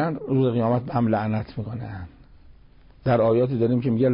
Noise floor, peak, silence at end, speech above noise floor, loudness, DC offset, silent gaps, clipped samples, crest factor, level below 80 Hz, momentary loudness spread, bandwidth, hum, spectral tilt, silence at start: -50 dBFS; -10 dBFS; 0 s; 28 dB; -23 LUFS; under 0.1%; none; under 0.1%; 12 dB; -50 dBFS; 14 LU; 5.4 kHz; none; -13 dB/octave; 0 s